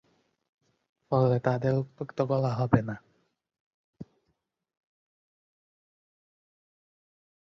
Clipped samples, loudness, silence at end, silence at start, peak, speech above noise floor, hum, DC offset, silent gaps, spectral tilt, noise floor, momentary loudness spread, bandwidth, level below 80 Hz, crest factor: under 0.1%; -28 LUFS; 3.55 s; 1.1 s; -6 dBFS; 52 dB; none; under 0.1%; 3.60-3.93 s; -9.5 dB/octave; -78 dBFS; 11 LU; 6.4 kHz; -60 dBFS; 26 dB